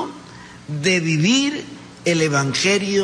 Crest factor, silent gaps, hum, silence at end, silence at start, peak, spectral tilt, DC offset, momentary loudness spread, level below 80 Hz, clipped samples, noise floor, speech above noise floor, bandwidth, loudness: 14 dB; none; none; 0 s; 0 s; -6 dBFS; -4 dB/octave; under 0.1%; 21 LU; -58 dBFS; under 0.1%; -40 dBFS; 21 dB; 10.5 kHz; -18 LUFS